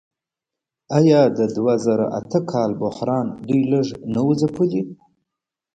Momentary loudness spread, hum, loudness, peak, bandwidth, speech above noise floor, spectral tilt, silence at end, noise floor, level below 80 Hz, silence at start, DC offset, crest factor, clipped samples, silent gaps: 8 LU; none; -20 LUFS; -2 dBFS; 9 kHz; 67 dB; -8 dB/octave; 0.8 s; -86 dBFS; -58 dBFS; 0.9 s; under 0.1%; 18 dB; under 0.1%; none